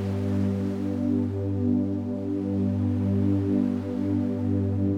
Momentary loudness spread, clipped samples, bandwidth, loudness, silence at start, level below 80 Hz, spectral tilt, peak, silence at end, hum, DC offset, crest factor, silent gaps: 4 LU; under 0.1%; 6.4 kHz; -26 LUFS; 0 s; -68 dBFS; -10 dB/octave; -12 dBFS; 0 s; none; under 0.1%; 12 dB; none